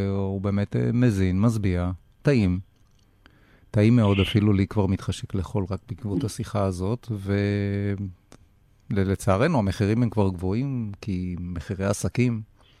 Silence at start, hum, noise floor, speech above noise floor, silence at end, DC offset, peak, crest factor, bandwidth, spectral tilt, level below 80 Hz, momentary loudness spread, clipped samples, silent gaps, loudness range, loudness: 0 s; none; -58 dBFS; 35 dB; 0.35 s; under 0.1%; -8 dBFS; 16 dB; 13 kHz; -7 dB/octave; -50 dBFS; 10 LU; under 0.1%; none; 4 LU; -25 LUFS